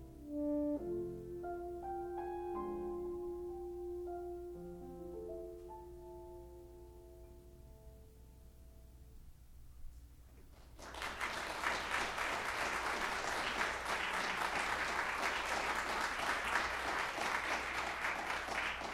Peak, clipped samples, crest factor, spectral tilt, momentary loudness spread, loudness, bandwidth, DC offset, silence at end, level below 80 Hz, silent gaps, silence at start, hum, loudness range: -20 dBFS; under 0.1%; 22 dB; -3 dB/octave; 22 LU; -39 LUFS; 19.5 kHz; under 0.1%; 0 s; -58 dBFS; none; 0 s; none; 22 LU